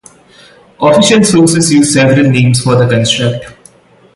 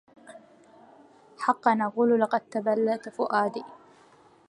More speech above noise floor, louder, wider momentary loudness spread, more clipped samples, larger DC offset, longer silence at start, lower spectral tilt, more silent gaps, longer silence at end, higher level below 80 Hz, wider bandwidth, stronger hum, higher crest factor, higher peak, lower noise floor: about the same, 34 dB vs 32 dB; first, -8 LUFS vs -26 LUFS; about the same, 6 LU vs 7 LU; neither; neither; first, 0.8 s vs 0.3 s; second, -5 dB/octave vs -6.5 dB/octave; neither; about the same, 0.65 s vs 0.75 s; first, -44 dBFS vs -82 dBFS; about the same, 11.5 kHz vs 11 kHz; neither; second, 10 dB vs 22 dB; first, 0 dBFS vs -8 dBFS; second, -42 dBFS vs -57 dBFS